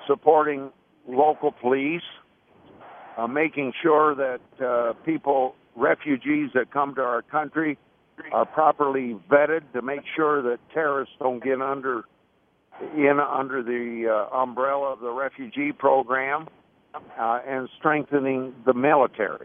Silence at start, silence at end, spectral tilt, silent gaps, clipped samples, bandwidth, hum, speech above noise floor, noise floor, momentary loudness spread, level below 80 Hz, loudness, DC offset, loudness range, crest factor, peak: 0 s; 0 s; -9.5 dB/octave; none; under 0.1%; 3.7 kHz; none; 41 dB; -65 dBFS; 10 LU; -72 dBFS; -24 LUFS; under 0.1%; 3 LU; 22 dB; -4 dBFS